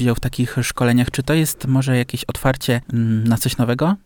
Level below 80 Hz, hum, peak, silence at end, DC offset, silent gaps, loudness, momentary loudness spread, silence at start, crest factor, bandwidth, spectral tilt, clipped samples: -38 dBFS; none; -4 dBFS; 0.1 s; under 0.1%; none; -19 LUFS; 4 LU; 0 s; 14 dB; over 20 kHz; -5.5 dB/octave; under 0.1%